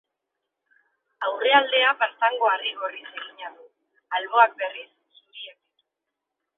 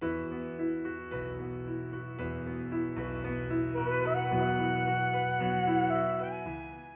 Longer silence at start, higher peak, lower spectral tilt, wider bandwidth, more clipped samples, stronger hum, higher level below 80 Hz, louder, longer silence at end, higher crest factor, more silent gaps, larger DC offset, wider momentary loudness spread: first, 1.2 s vs 0 s; first, -2 dBFS vs -18 dBFS; about the same, -4.5 dB/octave vs -5.5 dB/octave; about the same, 4.1 kHz vs 3.9 kHz; neither; neither; second, -88 dBFS vs -52 dBFS; first, -22 LUFS vs -32 LUFS; first, 1.1 s vs 0 s; first, 24 dB vs 14 dB; neither; neither; first, 21 LU vs 10 LU